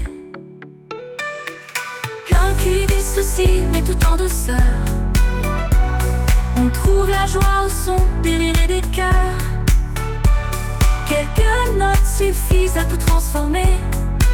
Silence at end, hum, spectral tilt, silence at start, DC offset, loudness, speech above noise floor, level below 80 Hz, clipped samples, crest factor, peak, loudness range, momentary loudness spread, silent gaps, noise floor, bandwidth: 0 s; none; -5 dB/octave; 0 s; under 0.1%; -18 LUFS; 23 dB; -18 dBFS; under 0.1%; 12 dB; -4 dBFS; 1 LU; 9 LU; none; -38 dBFS; 18 kHz